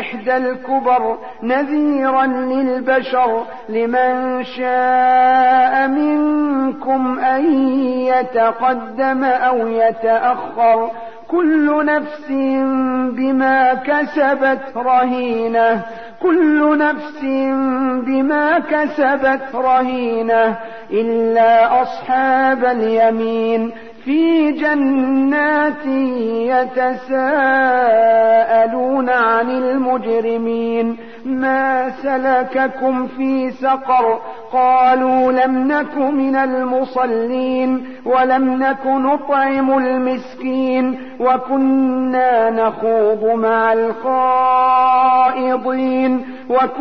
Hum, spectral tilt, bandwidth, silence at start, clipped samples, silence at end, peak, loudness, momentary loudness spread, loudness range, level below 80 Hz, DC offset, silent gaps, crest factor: none; -7 dB/octave; 6 kHz; 0 s; under 0.1%; 0 s; -4 dBFS; -16 LUFS; 7 LU; 3 LU; -58 dBFS; 0.9%; none; 10 dB